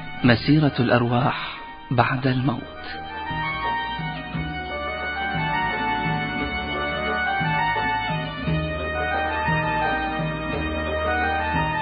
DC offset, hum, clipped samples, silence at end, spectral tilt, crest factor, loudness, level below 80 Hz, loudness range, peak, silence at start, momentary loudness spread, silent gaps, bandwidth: under 0.1%; none; under 0.1%; 0 s; -11 dB/octave; 22 dB; -23 LUFS; -38 dBFS; 3 LU; 0 dBFS; 0 s; 10 LU; none; 5.2 kHz